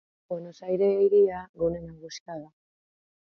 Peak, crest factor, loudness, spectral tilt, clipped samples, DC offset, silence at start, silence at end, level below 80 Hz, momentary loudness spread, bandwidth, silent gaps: -12 dBFS; 16 dB; -25 LUFS; -6.5 dB/octave; under 0.1%; under 0.1%; 0.3 s; 0.8 s; -58 dBFS; 20 LU; 6.8 kHz; 1.49-1.54 s, 2.20-2.26 s